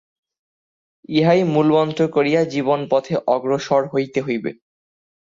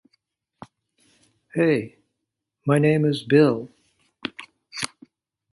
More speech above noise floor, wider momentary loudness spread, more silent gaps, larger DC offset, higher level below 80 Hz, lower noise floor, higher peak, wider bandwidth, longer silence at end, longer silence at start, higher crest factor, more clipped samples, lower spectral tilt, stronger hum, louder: first, over 72 dB vs 62 dB; second, 7 LU vs 20 LU; neither; neither; about the same, -62 dBFS vs -66 dBFS; first, under -90 dBFS vs -82 dBFS; about the same, -4 dBFS vs -4 dBFS; second, 7.6 kHz vs 11.5 kHz; first, 0.85 s vs 0.65 s; second, 1.1 s vs 1.55 s; about the same, 16 dB vs 20 dB; neither; about the same, -7 dB/octave vs -6.5 dB/octave; neither; first, -19 LUFS vs -22 LUFS